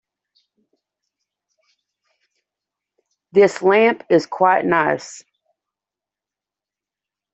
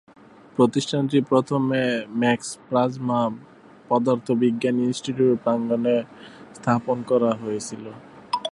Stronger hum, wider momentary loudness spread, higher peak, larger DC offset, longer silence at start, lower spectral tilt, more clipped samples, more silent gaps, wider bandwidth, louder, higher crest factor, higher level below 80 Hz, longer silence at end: first, 50 Hz at -50 dBFS vs none; second, 7 LU vs 11 LU; about the same, -2 dBFS vs -4 dBFS; neither; first, 3.35 s vs 0.6 s; about the same, -5.5 dB/octave vs -6 dB/octave; neither; neither; second, 8.2 kHz vs 11.5 kHz; first, -16 LUFS vs -23 LUFS; about the same, 20 dB vs 18 dB; about the same, -68 dBFS vs -66 dBFS; first, 2.15 s vs 0.05 s